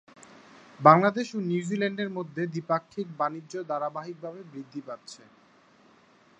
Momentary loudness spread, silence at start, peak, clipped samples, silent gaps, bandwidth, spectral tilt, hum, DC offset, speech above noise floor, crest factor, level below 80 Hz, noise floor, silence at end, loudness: 21 LU; 0.8 s; -2 dBFS; under 0.1%; none; 9.6 kHz; -6.5 dB/octave; none; under 0.1%; 32 dB; 28 dB; -78 dBFS; -59 dBFS; 1.25 s; -26 LUFS